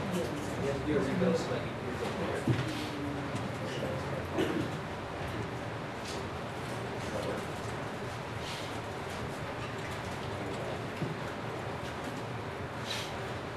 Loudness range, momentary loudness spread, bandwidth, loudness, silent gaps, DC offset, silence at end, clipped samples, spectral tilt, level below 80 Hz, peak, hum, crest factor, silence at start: 4 LU; 7 LU; 13 kHz; -36 LUFS; none; under 0.1%; 0 s; under 0.1%; -5.5 dB/octave; -52 dBFS; -16 dBFS; none; 18 dB; 0 s